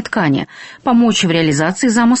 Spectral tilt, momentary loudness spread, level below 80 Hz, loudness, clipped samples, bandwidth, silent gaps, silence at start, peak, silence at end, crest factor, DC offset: -4.5 dB/octave; 8 LU; -50 dBFS; -14 LUFS; under 0.1%; 8.6 kHz; none; 0 s; -2 dBFS; 0 s; 12 dB; under 0.1%